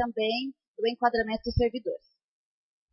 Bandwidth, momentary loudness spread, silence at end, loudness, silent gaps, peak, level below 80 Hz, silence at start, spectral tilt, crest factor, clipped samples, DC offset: 5.8 kHz; 11 LU; 0.95 s; -29 LUFS; 0.68-0.74 s; -10 dBFS; -44 dBFS; 0 s; -8.5 dB/octave; 20 dB; under 0.1%; under 0.1%